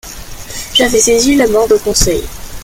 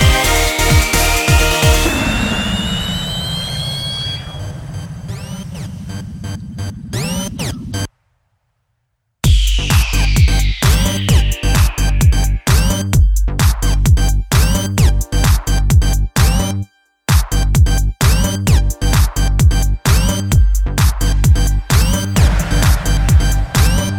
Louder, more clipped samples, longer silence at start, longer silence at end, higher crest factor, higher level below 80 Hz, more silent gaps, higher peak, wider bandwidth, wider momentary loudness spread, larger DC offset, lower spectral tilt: first, -10 LUFS vs -15 LUFS; neither; about the same, 0.05 s vs 0 s; about the same, 0 s vs 0 s; about the same, 12 dB vs 14 dB; second, -28 dBFS vs -16 dBFS; neither; about the same, 0 dBFS vs 0 dBFS; about the same, 17 kHz vs 18.5 kHz; first, 18 LU vs 14 LU; neither; second, -2.5 dB/octave vs -4.5 dB/octave